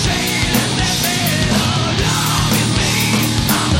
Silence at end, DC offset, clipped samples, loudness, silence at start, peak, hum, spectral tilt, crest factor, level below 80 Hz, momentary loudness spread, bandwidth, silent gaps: 0 s; under 0.1%; under 0.1%; -15 LUFS; 0 s; -4 dBFS; none; -3.5 dB/octave; 12 dB; -30 dBFS; 1 LU; 16.5 kHz; none